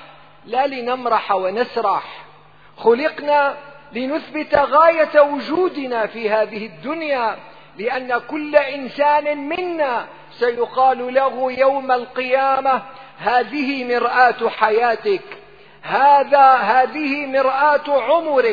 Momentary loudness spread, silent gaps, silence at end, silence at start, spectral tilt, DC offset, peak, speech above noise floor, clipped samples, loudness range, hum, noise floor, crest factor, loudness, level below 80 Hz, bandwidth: 11 LU; none; 0 s; 0 s; -6 dB/octave; 0.3%; 0 dBFS; 30 dB; under 0.1%; 5 LU; none; -47 dBFS; 18 dB; -18 LUFS; -60 dBFS; 5 kHz